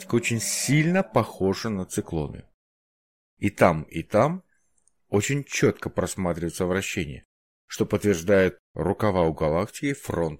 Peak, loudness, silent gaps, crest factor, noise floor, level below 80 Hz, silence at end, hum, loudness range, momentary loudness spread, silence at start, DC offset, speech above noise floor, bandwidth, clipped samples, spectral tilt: -4 dBFS; -25 LUFS; 2.54-3.37 s, 7.25-7.68 s, 8.59-8.75 s; 22 dB; -70 dBFS; -50 dBFS; 0.05 s; none; 2 LU; 9 LU; 0 s; 0.1%; 46 dB; 16.5 kHz; under 0.1%; -5 dB/octave